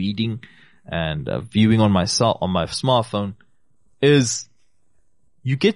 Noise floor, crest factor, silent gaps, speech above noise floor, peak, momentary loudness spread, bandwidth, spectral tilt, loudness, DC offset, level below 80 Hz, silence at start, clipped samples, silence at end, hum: -67 dBFS; 16 dB; none; 48 dB; -4 dBFS; 12 LU; 11.5 kHz; -5 dB/octave; -20 LUFS; 0.2%; -48 dBFS; 0 s; under 0.1%; 0 s; none